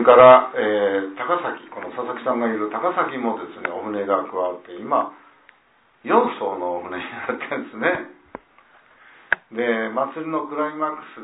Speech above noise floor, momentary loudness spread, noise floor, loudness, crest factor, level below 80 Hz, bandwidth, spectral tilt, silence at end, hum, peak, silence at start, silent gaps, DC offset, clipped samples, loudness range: 38 dB; 10 LU; -59 dBFS; -21 LUFS; 20 dB; -64 dBFS; 4 kHz; -9 dB/octave; 0 s; none; 0 dBFS; 0 s; none; under 0.1%; under 0.1%; 3 LU